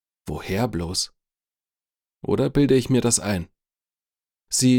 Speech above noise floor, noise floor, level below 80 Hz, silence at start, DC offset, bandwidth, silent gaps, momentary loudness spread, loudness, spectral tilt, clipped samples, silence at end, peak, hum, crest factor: over 69 dB; under -90 dBFS; -46 dBFS; 0.25 s; under 0.1%; 18.5 kHz; none; 15 LU; -22 LUFS; -4.5 dB/octave; under 0.1%; 0 s; -6 dBFS; none; 18 dB